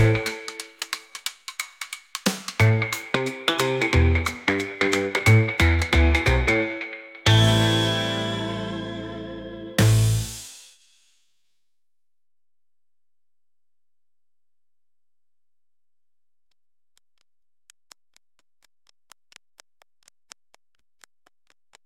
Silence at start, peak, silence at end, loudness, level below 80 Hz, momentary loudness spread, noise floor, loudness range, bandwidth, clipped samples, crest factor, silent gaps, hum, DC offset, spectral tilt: 0 s; -4 dBFS; 11.25 s; -22 LUFS; -36 dBFS; 15 LU; under -90 dBFS; 7 LU; 17 kHz; under 0.1%; 22 dB; none; none; under 0.1%; -5 dB/octave